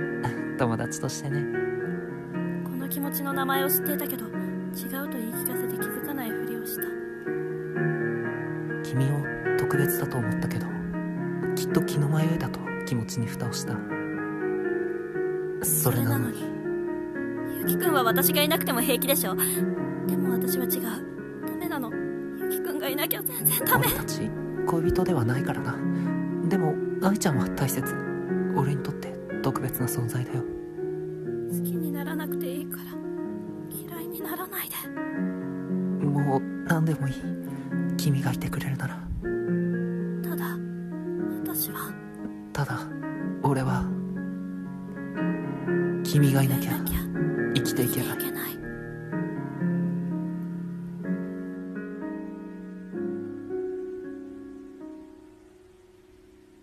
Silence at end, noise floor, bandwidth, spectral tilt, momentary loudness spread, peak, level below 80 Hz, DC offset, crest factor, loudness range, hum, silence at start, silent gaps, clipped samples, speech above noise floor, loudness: 0.45 s; -54 dBFS; 14.5 kHz; -5.5 dB/octave; 11 LU; -8 dBFS; -52 dBFS; under 0.1%; 20 dB; 7 LU; none; 0 s; none; under 0.1%; 28 dB; -28 LUFS